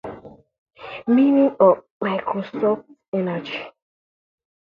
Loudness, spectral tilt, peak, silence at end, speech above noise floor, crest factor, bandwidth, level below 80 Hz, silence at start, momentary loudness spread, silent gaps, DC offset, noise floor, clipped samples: -20 LUFS; -9 dB/octave; -2 dBFS; 1 s; 21 dB; 20 dB; 5.4 kHz; -64 dBFS; 0.05 s; 21 LU; 0.58-0.66 s, 1.90-2.00 s, 3.08-3.12 s; under 0.1%; -40 dBFS; under 0.1%